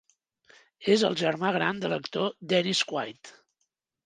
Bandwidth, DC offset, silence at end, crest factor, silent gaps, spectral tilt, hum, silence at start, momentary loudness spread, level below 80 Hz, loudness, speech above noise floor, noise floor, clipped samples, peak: 10 kHz; under 0.1%; 0.75 s; 20 dB; none; -4 dB/octave; none; 0.8 s; 9 LU; -76 dBFS; -27 LUFS; 53 dB; -80 dBFS; under 0.1%; -10 dBFS